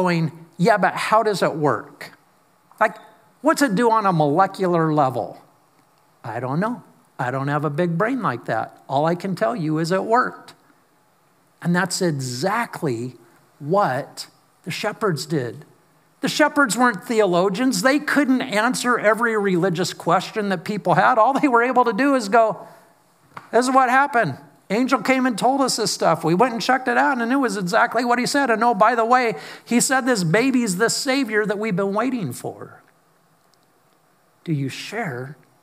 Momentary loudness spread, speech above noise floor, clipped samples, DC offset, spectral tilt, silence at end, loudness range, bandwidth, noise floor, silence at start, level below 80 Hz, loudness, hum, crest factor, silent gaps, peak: 11 LU; 40 dB; under 0.1%; under 0.1%; -5 dB/octave; 0.3 s; 7 LU; 16 kHz; -60 dBFS; 0 s; -78 dBFS; -20 LUFS; none; 20 dB; none; -2 dBFS